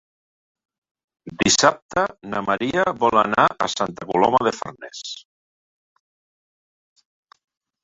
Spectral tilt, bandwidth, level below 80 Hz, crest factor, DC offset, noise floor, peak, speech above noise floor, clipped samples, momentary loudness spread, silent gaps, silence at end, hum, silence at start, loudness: -3 dB/octave; 8.4 kHz; -56 dBFS; 22 dB; under 0.1%; under -90 dBFS; -2 dBFS; over 70 dB; under 0.1%; 17 LU; 1.82-1.89 s; 2.65 s; none; 1.25 s; -20 LUFS